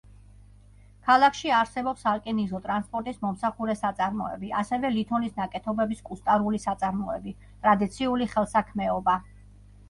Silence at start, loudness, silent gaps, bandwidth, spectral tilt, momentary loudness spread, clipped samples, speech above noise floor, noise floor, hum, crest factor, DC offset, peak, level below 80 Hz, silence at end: 1.05 s; -27 LUFS; none; 11.5 kHz; -5.5 dB/octave; 9 LU; under 0.1%; 26 dB; -52 dBFS; 50 Hz at -50 dBFS; 20 dB; under 0.1%; -8 dBFS; -52 dBFS; 0.65 s